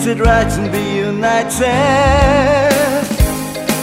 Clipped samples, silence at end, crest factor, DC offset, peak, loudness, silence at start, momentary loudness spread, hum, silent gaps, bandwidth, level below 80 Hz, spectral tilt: under 0.1%; 0 s; 12 dB; 0.2%; 0 dBFS; -13 LUFS; 0 s; 6 LU; none; none; 16.5 kHz; -22 dBFS; -5 dB/octave